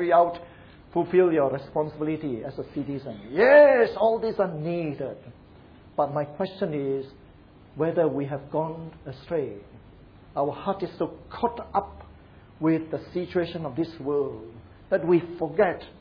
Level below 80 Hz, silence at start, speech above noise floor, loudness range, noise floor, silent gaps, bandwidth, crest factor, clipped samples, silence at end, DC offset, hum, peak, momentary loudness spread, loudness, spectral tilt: -56 dBFS; 0 s; 26 dB; 9 LU; -51 dBFS; none; 5.2 kHz; 20 dB; under 0.1%; 0.1 s; under 0.1%; none; -6 dBFS; 14 LU; -25 LUFS; -9.5 dB/octave